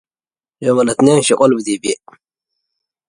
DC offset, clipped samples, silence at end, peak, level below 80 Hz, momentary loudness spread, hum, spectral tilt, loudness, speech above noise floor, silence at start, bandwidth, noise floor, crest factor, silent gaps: under 0.1%; under 0.1%; 1.15 s; 0 dBFS; -58 dBFS; 10 LU; none; -4.5 dB/octave; -14 LUFS; over 77 dB; 0.6 s; 11.5 kHz; under -90 dBFS; 16 dB; none